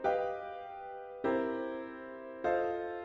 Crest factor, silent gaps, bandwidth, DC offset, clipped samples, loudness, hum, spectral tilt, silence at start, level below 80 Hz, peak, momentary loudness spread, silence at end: 16 dB; none; 7.4 kHz; under 0.1%; under 0.1%; -37 LUFS; none; -7 dB/octave; 0 s; -68 dBFS; -20 dBFS; 12 LU; 0 s